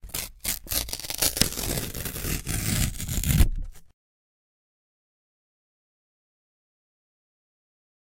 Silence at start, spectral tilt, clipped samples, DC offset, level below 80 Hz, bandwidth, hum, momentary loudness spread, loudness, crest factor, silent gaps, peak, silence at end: 0.05 s; -3 dB/octave; under 0.1%; under 0.1%; -34 dBFS; 17 kHz; none; 8 LU; -27 LUFS; 28 dB; none; -2 dBFS; 4.15 s